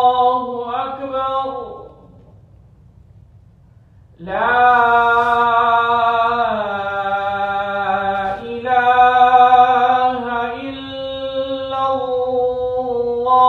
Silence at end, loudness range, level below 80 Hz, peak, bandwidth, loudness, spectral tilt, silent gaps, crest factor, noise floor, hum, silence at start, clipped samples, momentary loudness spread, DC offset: 0 s; 12 LU; -50 dBFS; 0 dBFS; 6.2 kHz; -16 LUFS; -5.5 dB/octave; none; 16 dB; -47 dBFS; none; 0 s; under 0.1%; 13 LU; under 0.1%